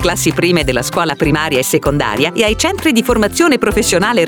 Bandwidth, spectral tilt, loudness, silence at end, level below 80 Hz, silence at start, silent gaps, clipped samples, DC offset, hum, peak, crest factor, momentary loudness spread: over 20 kHz; -4 dB/octave; -13 LUFS; 0 s; -30 dBFS; 0 s; none; under 0.1%; 0.1%; none; 0 dBFS; 12 dB; 3 LU